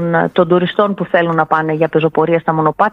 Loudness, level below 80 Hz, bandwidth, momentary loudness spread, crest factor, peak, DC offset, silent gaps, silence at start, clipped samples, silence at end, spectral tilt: -14 LUFS; -54 dBFS; 5.4 kHz; 2 LU; 14 dB; 0 dBFS; under 0.1%; none; 0 s; under 0.1%; 0 s; -9 dB/octave